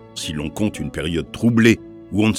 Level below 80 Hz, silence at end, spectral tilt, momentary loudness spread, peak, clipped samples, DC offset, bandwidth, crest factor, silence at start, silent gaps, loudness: -42 dBFS; 0 s; -5.5 dB/octave; 11 LU; 0 dBFS; under 0.1%; under 0.1%; 15 kHz; 20 dB; 0.05 s; none; -20 LUFS